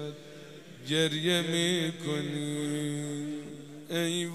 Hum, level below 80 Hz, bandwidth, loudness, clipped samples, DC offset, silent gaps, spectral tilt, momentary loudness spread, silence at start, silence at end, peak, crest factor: none; -74 dBFS; 15.5 kHz; -30 LUFS; under 0.1%; 0.1%; none; -4 dB/octave; 19 LU; 0 s; 0 s; -12 dBFS; 20 dB